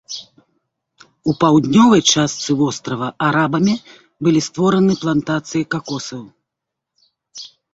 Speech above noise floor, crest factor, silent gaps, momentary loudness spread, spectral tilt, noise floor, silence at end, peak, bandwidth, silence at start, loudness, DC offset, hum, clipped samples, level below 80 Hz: 65 dB; 16 dB; none; 19 LU; -4.5 dB/octave; -81 dBFS; 0.25 s; -2 dBFS; 8 kHz; 0.1 s; -16 LUFS; under 0.1%; none; under 0.1%; -54 dBFS